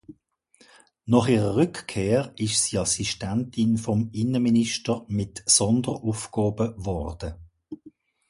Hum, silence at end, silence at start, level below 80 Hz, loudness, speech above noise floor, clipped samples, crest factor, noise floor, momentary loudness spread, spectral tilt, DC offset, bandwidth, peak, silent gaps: none; 0.4 s; 0.1 s; -46 dBFS; -24 LUFS; 37 dB; under 0.1%; 20 dB; -61 dBFS; 14 LU; -4.5 dB/octave; under 0.1%; 11.5 kHz; -4 dBFS; none